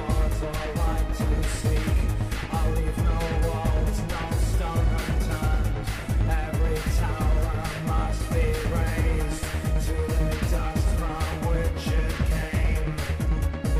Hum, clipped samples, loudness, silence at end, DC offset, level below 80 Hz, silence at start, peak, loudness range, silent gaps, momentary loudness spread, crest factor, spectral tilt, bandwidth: none; under 0.1%; -27 LUFS; 0 s; under 0.1%; -26 dBFS; 0 s; -12 dBFS; 0 LU; none; 3 LU; 10 dB; -6 dB/octave; 15 kHz